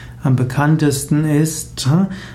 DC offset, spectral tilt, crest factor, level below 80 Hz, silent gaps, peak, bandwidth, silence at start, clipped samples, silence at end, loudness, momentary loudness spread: under 0.1%; -6 dB/octave; 12 dB; -42 dBFS; none; -4 dBFS; 15 kHz; 0 s; under 0.1%; 0 s; -16 LUFS; 4 LU